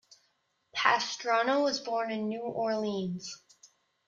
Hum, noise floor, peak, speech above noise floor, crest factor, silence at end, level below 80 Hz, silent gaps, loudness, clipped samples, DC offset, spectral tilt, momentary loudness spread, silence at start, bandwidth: none; -75 dBFS; -8 dBFS; 44 dB; 24 dB; 0.4 s; -78 dBFS; none; -30 LUFS; under 0.1%; under 0.1%; -3.5 dB/octave; 13 LU; 0.75 s; 7.6 kHz